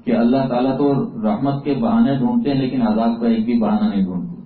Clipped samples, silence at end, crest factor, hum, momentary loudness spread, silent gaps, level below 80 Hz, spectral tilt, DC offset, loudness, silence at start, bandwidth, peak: under 0.1%; 0.05 s; 12 dB; none; 4 LU; none; -48 dBFS; -13 dB/octave; under 0.1%; -18 LUFS; 0.05 s; 4.6 kHz; -6 dBFS